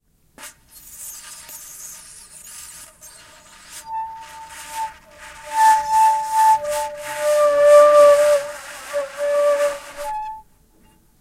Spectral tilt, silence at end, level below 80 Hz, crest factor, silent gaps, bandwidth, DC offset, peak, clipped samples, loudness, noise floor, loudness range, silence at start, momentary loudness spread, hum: -1 dB/octave; 0.8 s; -56 dBFS; 18 dB; none; 16 kHz; under 0.1%; -2 dBFS; under 0.1%; -17 LUFS; -54 dBFS; 21 LU; 0.4 s; 26 LU; none